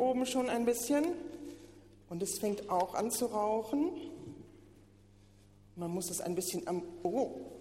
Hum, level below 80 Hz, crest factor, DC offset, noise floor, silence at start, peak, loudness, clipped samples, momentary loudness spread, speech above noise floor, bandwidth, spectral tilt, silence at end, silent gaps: none; -66 dBFS; 16 dB; under 0.1%; -61 dBFS; 0 s; -20 dBFS; -35 LUFS; under 0.1%; 16 LU; 26 dB; 16 kHz; -4.5 dB/octave; 0 s; none